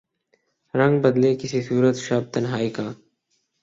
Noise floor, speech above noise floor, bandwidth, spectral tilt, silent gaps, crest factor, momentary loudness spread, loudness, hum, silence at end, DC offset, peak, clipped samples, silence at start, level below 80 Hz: -71 dBFS; 51 dB; 7.8 kHz; -6.5 dB/octave; none; 18 dB; 10 LU; -22 LUFS; none; 0.7 s; under 0.1%; -4 dBFS; under 0.1%; 0.75 s; -62 dBFS